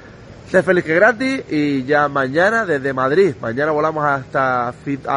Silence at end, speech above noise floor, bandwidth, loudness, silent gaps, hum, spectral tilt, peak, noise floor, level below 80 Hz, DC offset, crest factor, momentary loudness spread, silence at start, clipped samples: 0 s; 22 dB; 11 kHz; -17 LUFS; none; none; -6.5 dB/octave; -2 dBFS; -38 dBFS; -52 dBFS; under 0.1%; 16 dB; 6 LU; 0 s; under 0.1%